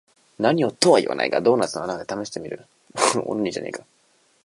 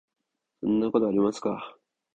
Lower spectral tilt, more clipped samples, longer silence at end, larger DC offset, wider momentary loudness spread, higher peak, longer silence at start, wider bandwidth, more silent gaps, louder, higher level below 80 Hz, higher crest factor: second, -4 dB/octave vs -7 dB/octave; neither; first, 0.65 s vs 0.45 s; neither; first, 18 LU vs 12 LU; first, -2 dBFS vs -10 dBFS; second, 0.4 s vs 0.6 s; first, 11.5 kHz vs 9.2 kHz; neither; first, -22 LUFS vs -27 LUFS; about the same, -64 dBFS vs -64 dBFS; about the same, 22 dB vs 18 dB